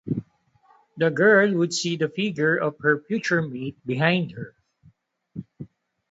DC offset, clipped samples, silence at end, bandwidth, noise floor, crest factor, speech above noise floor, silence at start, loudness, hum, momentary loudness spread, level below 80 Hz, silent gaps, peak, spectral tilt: under 0.1%; under 0.1%; 0.45 s; 8 kHz; -61 dBFS; 20 dB; 38 dB; 0.05 s; -23 LUFS; none; 23 LU; -64 dBFS; none; -4 dBFS; -5 dB/octave